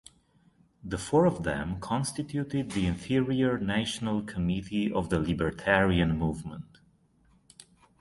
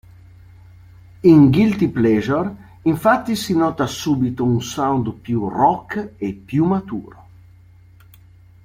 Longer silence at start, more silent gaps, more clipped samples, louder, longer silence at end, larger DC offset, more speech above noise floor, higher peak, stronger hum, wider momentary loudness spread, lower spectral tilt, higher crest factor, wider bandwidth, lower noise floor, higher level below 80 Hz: second, 0.85 s vs 1.25 s; neither; neither; second, -29 LUFS vs -18 LUFS; second, 1.35 s vs 1.5 s; neither; first, 36 dB vs 29 dB; second, -8 dBFS vs -2 dBFS; neither; second, 9 LU vs 12 LU; about the same, -6 dB/octave vs -7 dB/octave; about the same, 22 dB vs 18 dB; second, 12 kHz vs 16 kHz; first, -64 dBFS vs -47 dBFS; about the same, -46 dBFS vs -48 dBFS